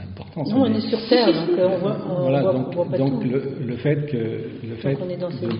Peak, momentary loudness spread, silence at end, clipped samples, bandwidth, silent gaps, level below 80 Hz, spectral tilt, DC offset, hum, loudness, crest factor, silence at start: -2 dBFS; 10 LU; 0 s; under 0.1%; 5.4 kHz; none; -58 dBFS; -6 dB/octave; under 0.1%; none; -22 LUFS; 18 dB; 0 s